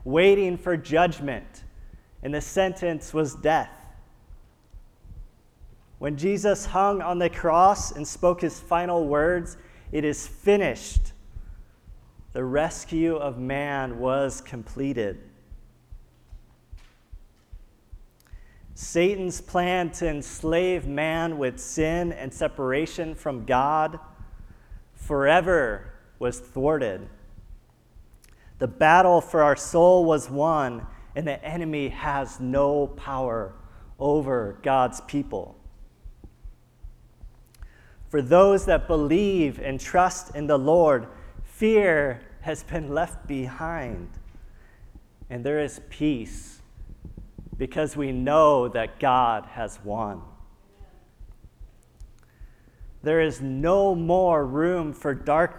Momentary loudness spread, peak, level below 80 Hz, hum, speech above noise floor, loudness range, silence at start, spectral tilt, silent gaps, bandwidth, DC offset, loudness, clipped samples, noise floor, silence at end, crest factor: 15 LU; -4 dBFS; -42 dBFS; none; 29 dB; 10 LU; 0 s; -5.5 dB/octave; none; 14.5 kHz; under 0.1%; -24 LUFS; under 0.1%; -52 dBFS; 0 s; 22 dB